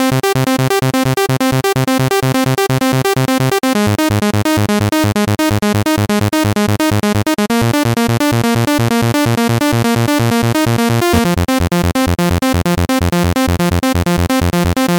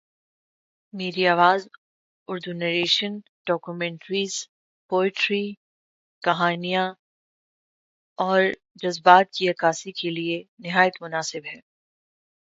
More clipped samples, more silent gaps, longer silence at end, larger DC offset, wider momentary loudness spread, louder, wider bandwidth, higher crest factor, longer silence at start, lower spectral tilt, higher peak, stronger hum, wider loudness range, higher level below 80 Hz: neither; second, none vs 1.78-2.26 s, 3.29-3.45 s, 4.49-4.89 s, 5.57-6.21 s, 6.99-8.16 s, 8.71-8.75 s, 10.48-10.57 s; second, 0 s vs 0.85 s; neither; second, 1 LU vs 14 LU; first, -13 LUFS vs -23 LUFS; first, 18 kHz vs 8 kHz; second, 12 dB vs 24 dB; second, 0 s vs 0.95 s; first, -5.5 dB/octave vs -4 dB/octave; about the same, 0 dBFS vs 0 dBFS; neither; second, 1 LU vs 5 LU; first, -32 dBFS vs -76 dBFS